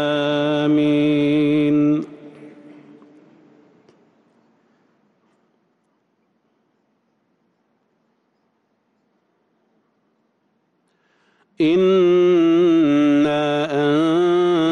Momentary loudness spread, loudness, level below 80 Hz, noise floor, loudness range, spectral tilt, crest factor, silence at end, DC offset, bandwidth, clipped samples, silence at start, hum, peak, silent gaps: 5 LU; -17 LUFS; -66 dBFS; -67 dBFS; 10 LU; -7 dB/octave; 12 dB; 0 s; under 0.1%; 6.8 kHz; under 0.1%; 0 s; none; -10 dBFS; none